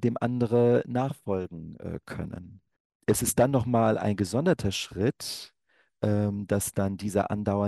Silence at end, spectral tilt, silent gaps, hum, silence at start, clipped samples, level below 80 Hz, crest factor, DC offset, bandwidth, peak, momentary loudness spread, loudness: 0 s; -5.5 dB/octave; 2.80-3.00 s; none; 0 s; under 0.1%; -54 dBFS; 18 dB; under 0.1%; 13 kHz; -10 dBFS; 15 LU; -27 LUFS